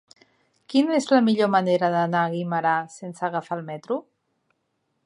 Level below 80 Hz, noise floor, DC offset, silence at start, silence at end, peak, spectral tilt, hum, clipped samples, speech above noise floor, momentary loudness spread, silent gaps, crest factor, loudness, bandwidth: -78 dBFS; -74 dBFS; under 0.1%; 0.7 s; 1.05 s; -6 dBFS; -6 dB/octave; none; under 0.1%; 52 dB; 11 LU; none; 18 dB; -23 LUFS; 11 kHz